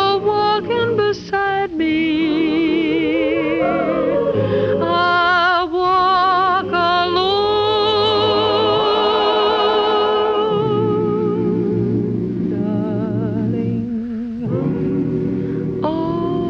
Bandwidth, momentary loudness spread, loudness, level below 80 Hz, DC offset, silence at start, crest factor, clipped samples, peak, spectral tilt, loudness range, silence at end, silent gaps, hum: 6.8 kHz; 6 LU; -17 LUFS; -46 dBFS; under 0.1%; 0 s; 12 dB; under 0.1%; -4 dBFS; -7 dB/octave; 5 LU; 0 s; none; none